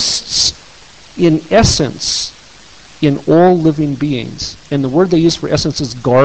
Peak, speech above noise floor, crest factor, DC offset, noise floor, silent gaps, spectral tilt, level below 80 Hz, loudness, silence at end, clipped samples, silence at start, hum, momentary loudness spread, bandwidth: 0 dBFS; 28 dB; 14 dB; 0.6%; -40 dBFS; none; -4.5 dB/octave; -34 dBFS; -13 LUFS; 0 s; under 0.1%; 0 s; none; 9 LU; 9 kHz